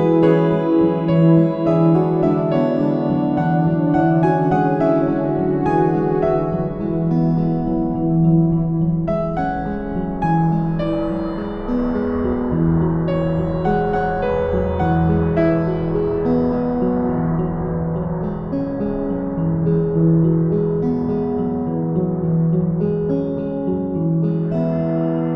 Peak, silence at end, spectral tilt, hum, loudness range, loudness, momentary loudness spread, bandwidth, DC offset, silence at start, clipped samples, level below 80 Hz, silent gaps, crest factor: -2 dBFS; 0 s; -11 dB/octave; none; 4 LU; -18 LUFS; 7 LU; 4.3 kHz; under 0.1%; 0 s; under 0.1%; -36 dBFS; none; 16 dB